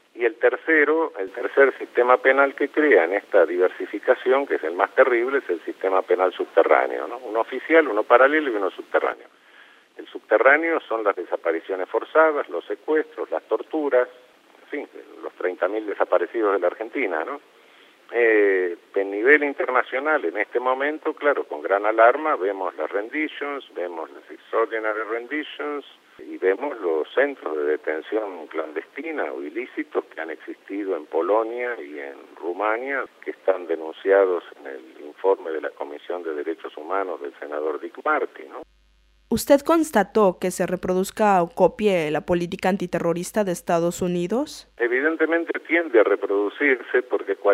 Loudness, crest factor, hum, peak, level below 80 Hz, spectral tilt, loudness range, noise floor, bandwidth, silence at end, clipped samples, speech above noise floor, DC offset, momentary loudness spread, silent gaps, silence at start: -22 LUFS; 22 dB; none; 0 dBFS; -62 dBFS; -5 dB/octave; 8 LU; -59 dBFS; 15.5 kHz; 0 s; under 0.1%; 37 dB; under 0.1%; 14 LU; none; 0.15 s